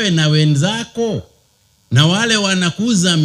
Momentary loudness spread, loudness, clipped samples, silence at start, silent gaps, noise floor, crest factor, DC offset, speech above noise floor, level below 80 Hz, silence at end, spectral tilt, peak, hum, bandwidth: 8 LU; -15 LUFS; under 0.1%; 0 s; none; -56 dBFS; 16 dB; under 0.1%; 42 dB; -52 dBFS; 0 s; -4.5 dB/octave; 0 dBFS; none; 12.5 kHz